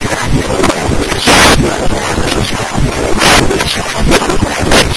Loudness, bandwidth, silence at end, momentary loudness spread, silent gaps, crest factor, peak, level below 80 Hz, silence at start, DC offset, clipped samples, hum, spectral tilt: -10 LUFS; 11 kHz; 0 s; 8 LU; none; 10 dB; 0 dBFS; -20 dBFS; 0 s; under 0.1%; 0.7%; none; -3.5 dB/octave